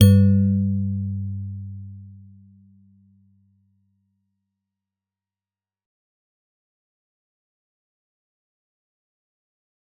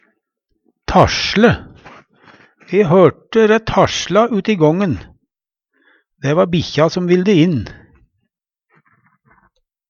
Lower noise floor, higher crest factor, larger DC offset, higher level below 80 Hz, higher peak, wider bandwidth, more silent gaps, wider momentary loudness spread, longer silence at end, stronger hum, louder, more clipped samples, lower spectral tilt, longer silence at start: first, under -90 dBFS vs -78 dBFS; first, 24 dB vs 16 dB; neither; second, -58 dBFS vs -40 dBFS; about the same, -2 dBFS vs 0 dBFS; second, 4.5 kHz vs 7.2 kHz; neither; first, 23 LU vs 10 LU; first, 7.85 s vs 2.15 s; neither; second, -21 LUFS vs -14 LUFS; neither; first, -9.5 dB/octave vs -6 dB/octave; second, 0 s vs 0.9 s